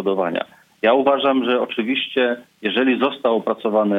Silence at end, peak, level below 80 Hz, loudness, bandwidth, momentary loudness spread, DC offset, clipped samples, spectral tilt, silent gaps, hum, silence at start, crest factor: 0 s; -4 dBFS; -72 dBFS; -19 LUFS; 5 kHz; 7 LU; under 0.1%; under 0.1%; -7 dB/octave; none; none; 0 s; 16 dB